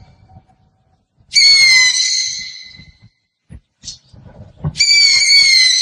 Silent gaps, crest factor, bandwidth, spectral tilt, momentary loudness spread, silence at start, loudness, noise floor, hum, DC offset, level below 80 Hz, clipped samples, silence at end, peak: none; 14 dB; 16 kHz; 1.5 dB/octave; 19 LU; 1.3 s; -8 LUFS; -59 dBFS; none; under 0.1%; -48 dBFS; under 0.1%; 0 s; 0 dBFS